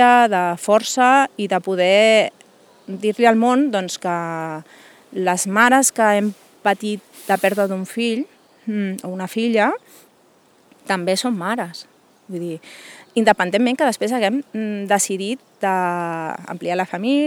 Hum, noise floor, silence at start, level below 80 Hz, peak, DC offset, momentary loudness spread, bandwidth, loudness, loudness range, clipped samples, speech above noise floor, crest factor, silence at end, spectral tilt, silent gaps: none; -55 dBFS; 0 s; -70 dBFS; 0 dBFS; under 0.1%; 15 LU; 20 kHz; -19 LUFS; 6 LU; under 0.1%; 36 dB; 20 dB; 0 s; -3.5 dB/octave; none